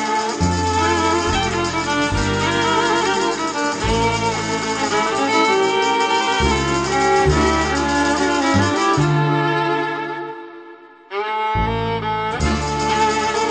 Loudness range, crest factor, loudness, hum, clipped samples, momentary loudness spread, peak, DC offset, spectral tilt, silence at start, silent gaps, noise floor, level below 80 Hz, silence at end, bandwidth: 5 LU; 14 dB; -18 LUFS; none; under 0.1%; 6 LU; -4 dBFS; under 0.1%; -4.5 dB/octave; 0 s; none; -41 dBFS; -32 dBFS; 0 s; 9.2 kHz